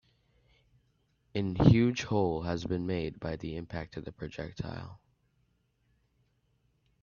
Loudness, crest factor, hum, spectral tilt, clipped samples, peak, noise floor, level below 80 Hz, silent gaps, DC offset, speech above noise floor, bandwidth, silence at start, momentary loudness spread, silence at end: -31 LUFS; 28 dB; none; -7.5 dB/octave; under 0.1%; -6 dBFS; -73 dBFS; -52 dBFS; none; under 0.1%; 43 dB; 7.2 kHz; 1.35 s; 18 LU; 2.05 s